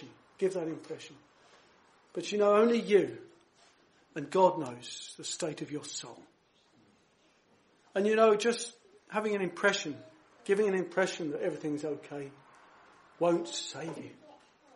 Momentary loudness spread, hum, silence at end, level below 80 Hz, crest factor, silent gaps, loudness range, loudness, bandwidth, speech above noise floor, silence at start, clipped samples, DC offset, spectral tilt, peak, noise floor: 19 LU; none; 0.45 s; -82 dBFS; 22 dB; none; 6 LU; -31 LUFS; 11.5 kHz; 37 dB; 0 s; under 0.1%; under 0.1%; -4 dB/octave; -12 dBFS; -68 dBFS